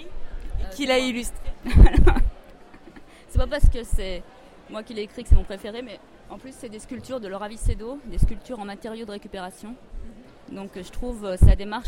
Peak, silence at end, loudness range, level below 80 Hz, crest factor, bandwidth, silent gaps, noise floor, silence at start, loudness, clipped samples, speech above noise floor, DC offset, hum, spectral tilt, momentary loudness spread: -2 dBFS; 0 s; 10 LU; -24 dBFS; 20 dB; 12 kHz; none; -46 dBFS; 0 s; -25 LUFS; under 0.1%; 25 dB; under 0.1%; none; -6 dB/octave; 21 LU